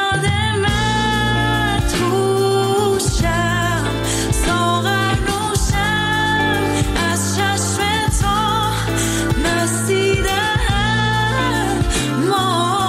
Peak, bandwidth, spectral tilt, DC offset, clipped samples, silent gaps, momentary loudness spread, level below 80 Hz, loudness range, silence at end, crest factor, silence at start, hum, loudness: -6 dBFS; 16 kHz; -4 dB/octave; under 0.1%; under 0.1%; none; 2 LU; -28 dBFS; 1 LU; 0 s; 10 dB; 0 s; none; -17 LUFS